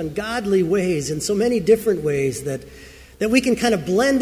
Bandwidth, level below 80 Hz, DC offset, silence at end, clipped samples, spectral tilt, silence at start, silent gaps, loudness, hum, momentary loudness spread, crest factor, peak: 16 kHz; -46 dBFS; under 0.1%; 0 s; under 0.1%; -5 dB/octave; 0 s; none; -20 LUFS; none; 8 LU; 16 dB; -4 dBFS